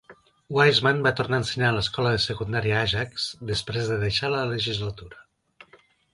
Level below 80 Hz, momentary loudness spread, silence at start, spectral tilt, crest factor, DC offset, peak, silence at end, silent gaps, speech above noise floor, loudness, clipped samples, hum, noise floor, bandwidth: -48 dBFS; 10 LU; 0.1 s; -5 dB/octave; 20 dB; under 0.1%; -6 dBFS; 0.9 s; none; 33 dB; -24 LUFS; under 0.1%; none; -58 dBFS; 11.5 kHz